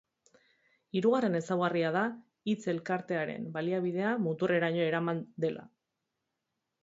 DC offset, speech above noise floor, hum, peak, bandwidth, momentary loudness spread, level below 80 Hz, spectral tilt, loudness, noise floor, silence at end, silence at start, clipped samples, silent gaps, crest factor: under 0.1%; 54 dB; none; -16 dBFS; 7.8 kHz; 7 LU; -78 dBFS; -7 dB/octave; -32 LUFS; -85 dBFS; 1.15 s; 0.95 s; under 0.1%; none; 18 dB